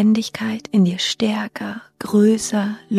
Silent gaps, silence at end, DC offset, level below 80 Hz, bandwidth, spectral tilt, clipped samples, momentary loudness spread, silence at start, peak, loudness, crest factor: none; 0 s; under 0.1%; -60 dBFS; 14 kHz; -5 dB/octave; under 0.1%; 13 LU; 0 s; -6 dBFS; -19 LUFS; 12 dB